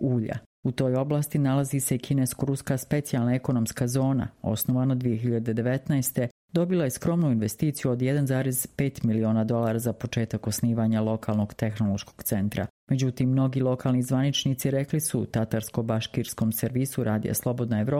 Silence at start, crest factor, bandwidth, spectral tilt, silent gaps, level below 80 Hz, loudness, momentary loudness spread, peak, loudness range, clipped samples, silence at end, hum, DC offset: 0 s; 16 dB; 16.5 kHz; -6 dB/octave; 0.46-0.63 s, 6.31-6.48 s, 12.70-12.87 s; -54 dBFS; -26 LUFS; 4 LU; -10 dBFS; 1 LU; under 0.1%; 0 s; none; under 0.1%